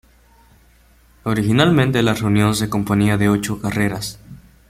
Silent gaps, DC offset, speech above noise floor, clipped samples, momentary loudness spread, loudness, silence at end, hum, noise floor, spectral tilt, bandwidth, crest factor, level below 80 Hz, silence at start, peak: none; under 0.1%; 35 dB; under 0.1%; 8 LU; -18 LUFS; 0.35 s; none; -52 dBFS; -6 dB/octave; 16 kHz; 18 dB; -44 dBFS; 1.25 s; 0 dBFS